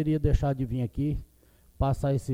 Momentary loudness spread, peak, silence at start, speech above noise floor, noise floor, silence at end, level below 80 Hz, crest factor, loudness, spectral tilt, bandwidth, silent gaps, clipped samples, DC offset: 6 LU; -10 dBFS; 0 s; 33 dB; -59 dBFS; 0 s; -36 dBFS; 18 dB; -29 LUFS; -9 dB/octave; 14.5 kHz; none; under 0.1%; under 0.1%